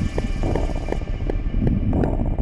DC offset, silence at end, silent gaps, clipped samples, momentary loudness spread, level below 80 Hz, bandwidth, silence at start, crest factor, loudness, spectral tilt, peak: under 0.1%; 0 s; none; under 0.1%; 6 LU; -24 dBFS; 8.4 kHz; 0 s; 14 dB; -24 LUFS; -8 dB/octave; -6 dBFS